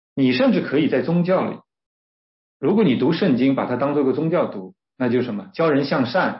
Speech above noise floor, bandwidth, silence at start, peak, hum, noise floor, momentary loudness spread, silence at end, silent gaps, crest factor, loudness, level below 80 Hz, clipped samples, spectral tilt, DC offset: over 71 dB; 5.8 kHz; 0.15 s; -6 dBFS; none; under -90 dBFS; 8 LU; 0 s; 1.86-2.60 s; 14 dB; -20 LUFS; -66 dBFS; under 0.1%; -11 dB/octave; under 0.1%